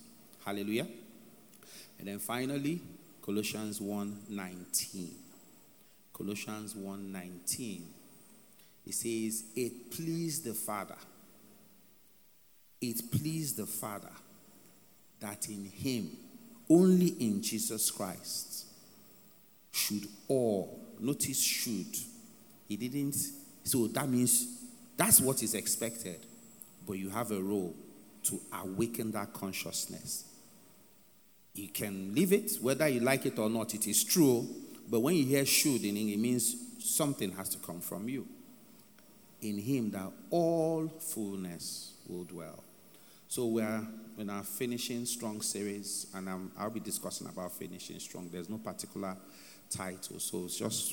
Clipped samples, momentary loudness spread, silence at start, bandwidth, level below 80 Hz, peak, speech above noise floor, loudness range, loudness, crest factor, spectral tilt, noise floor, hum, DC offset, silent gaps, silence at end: under 0.1%; 18 LU; 0 s; over 20 kHz; -76 dBFS; -8 dBFS; 30 dB; 11 LU; -34 LUFS; 28 dB; -4 dB/octave; -64 dBFS; none; under 0.1%; none; 0 s